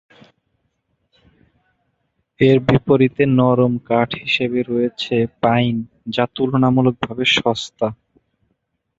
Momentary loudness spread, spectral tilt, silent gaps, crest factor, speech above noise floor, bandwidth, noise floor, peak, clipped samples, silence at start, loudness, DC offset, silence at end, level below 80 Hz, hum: 7 LU; -6.5 dB/octave; none; 18 dB; 54 dB; 7.8 kHz; -71 dBFS; 0 dBFS; under 0.1%; 2.4 s; -17 LUFS; under 0.1%; 1.05 s; -52 dBFS; none